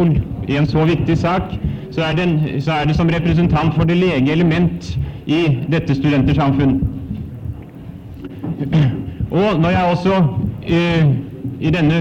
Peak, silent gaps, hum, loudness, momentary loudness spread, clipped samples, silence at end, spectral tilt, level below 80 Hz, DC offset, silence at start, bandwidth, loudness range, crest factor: -4 dBFS; none; none; -17 LUFS; 13 LU; under 0.1%; 0 s; -8 dB/octave; -32 dBFS; under 0.1%; 0 s; 7.4 kHz; 3 LU; 12 dB